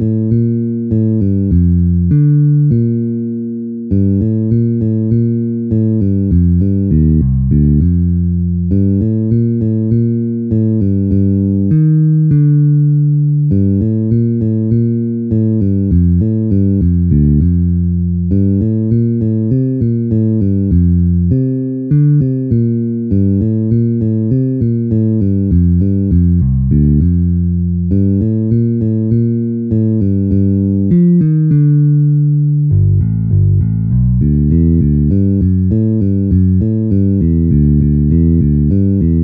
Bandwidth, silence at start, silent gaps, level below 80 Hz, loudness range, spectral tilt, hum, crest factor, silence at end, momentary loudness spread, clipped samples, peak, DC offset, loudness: 1.8 kHz; 0 s; none; -24 dBFS; 2 LU; -15 dB/octave; none; 10 dB; 0 s; 4 LU; under 0.1%; -2 dBFS; under 0.1%; -12 LUFS